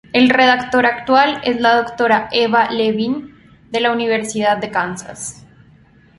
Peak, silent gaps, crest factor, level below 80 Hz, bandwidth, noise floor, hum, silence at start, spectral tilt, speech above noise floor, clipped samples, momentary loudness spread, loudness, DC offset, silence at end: 0 dBFS; none; 16 dB; -54 dBFS; 11.5 kHz; -48 dBFS; none; 0.15 s; -3.5 dB/octave; 33 dB; under 0.1%; 12 LU; -15 LUFS; under 0.1%; 0.85 s